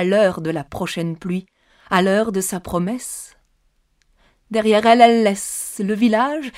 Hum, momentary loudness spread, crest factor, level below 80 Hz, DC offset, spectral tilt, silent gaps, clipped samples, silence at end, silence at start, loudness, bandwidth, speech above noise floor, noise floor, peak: none; 14 LU; 18 dB; -52 dBFS; under 0.1%; -4.5 dB/octave; none; under 0.1%; 0 s; 0 s; -18 LUFS; 16 kHz; 45 dB; -63 dBFS; 0 dBFS